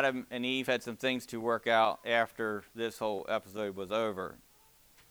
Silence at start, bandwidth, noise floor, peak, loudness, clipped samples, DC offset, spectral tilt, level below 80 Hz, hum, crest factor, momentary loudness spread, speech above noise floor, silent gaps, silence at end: 0 s; over 20 kHz; -63 dBFS; -12 dBFS; -33 LUFS; under 0.1%; under 0.1%; -4 dB/octave; -70 dBFS; none; 20 dB; 10 LU; 30 dB; none; 0.75 s